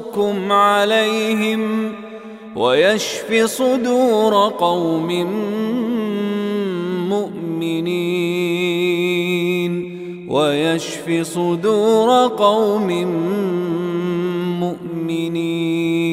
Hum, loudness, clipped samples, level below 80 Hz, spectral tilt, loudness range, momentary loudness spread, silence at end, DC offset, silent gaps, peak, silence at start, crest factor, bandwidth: none; -18 LUFS; under 0.1%; -62 dBFS; -5 dB/octave; 4 LU; 8 LU; 0 s; under 0.1%; none; -2 dBFS; 0 s; 16 dB; 16 kHz